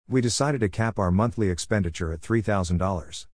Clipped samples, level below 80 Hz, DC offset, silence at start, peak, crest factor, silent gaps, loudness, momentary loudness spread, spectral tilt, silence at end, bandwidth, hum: under 0.1%; -42 dBFS; 0.4%; 0.1 s; -10 dBFS; 16 dB; none; -25 LUFS; 5 LU; -5.5 dB/octave; 0.1 s; 10.5 kHz; none